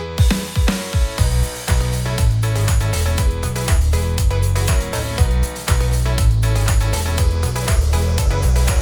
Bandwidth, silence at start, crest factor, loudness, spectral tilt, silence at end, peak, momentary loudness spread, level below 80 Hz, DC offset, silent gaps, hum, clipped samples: over 20 kHz; 0 s; 14 dB; -18 LUFS; -5 dB/octave; 0 s; -2 dBFS; 3 LU; -18 dBFS; under 0.1%; none; none; under 0.1%